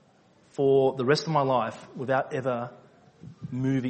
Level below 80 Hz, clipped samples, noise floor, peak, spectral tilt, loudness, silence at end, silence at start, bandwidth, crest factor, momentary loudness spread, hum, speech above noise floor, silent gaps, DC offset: -66 dBFS; under 0.1%; -60 dBFS; -8 dBFS; -6.5 dB/octave; -26 LUFS; 0 s; 0.6 s; 8.4 kHz; 18 dB; 15 LU; none; 34 dB; none; under 0.1%